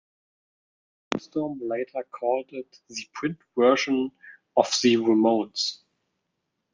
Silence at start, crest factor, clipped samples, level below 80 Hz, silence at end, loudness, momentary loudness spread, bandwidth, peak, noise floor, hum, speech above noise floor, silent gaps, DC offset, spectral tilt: 1.1 s; 24 dB; under 0.1%; -72 dBFS; 1 s; -25 LUFS; 16 LU; 9.8 kHz; -2 dBFS; -79 dBFS; none; 55 dB; none; under 0.1%; -4 dB/octave